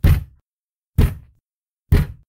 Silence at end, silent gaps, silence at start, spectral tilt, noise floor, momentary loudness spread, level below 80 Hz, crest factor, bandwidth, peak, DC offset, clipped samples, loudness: 0.15 s; 0.41-0.93 s, 1.54-1.66 s, 1.73-1.86 s; 0.05 s; -7.5 dB/octave; under -90 dBFS; 18 LU; -24 dBFS; 16 dB; 17.5 kHz; -4 dBFS; under 0.1%; under 0.1%; -21 LUFS